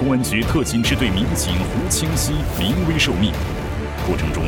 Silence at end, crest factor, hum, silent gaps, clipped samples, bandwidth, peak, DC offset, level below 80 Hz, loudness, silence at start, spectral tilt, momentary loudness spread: 0 s; 16 dB; none; none; under 0.1%; over 20 kHz; -2 dBFS; under 0.1%; -28 dBFS; -19 LUFS; 0 s; -4.5 dB/octave; 7 LU